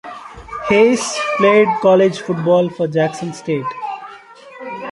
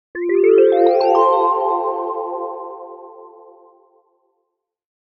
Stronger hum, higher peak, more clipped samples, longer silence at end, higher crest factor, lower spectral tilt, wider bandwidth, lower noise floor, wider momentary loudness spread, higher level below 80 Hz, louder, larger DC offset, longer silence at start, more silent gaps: neither; about the same, -2 dBFS vs -2 dBFS; neither; second, 0 s vs 1.75 s; about the same, 14 dB vs 16 dB; about the same, -5 dB/octave vs -5 dB/octave; first, 11.5 kHz vs 6 kHz; second, -39 dBFS vs -74 dBFS; about the same, 19 LU vs 21 LU; first, -52 dBFS vs -70 dBFS; about the same, -15 LUFS vs -16 LUFS; neither; about the same, 0.05 s vs 0.15 s; neither